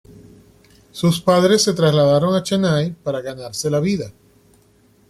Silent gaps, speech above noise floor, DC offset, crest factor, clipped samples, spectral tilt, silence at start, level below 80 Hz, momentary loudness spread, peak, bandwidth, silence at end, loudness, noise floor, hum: none; 37 dB; under 0.1%; 16 dB; under 0.1%; -5.5 dB/octave; 0.95 s; -54 dBFS; 12 LU; -2 dBFS; 15.5 kHz; 1 s; -18 LUFS; -54 dBFS; none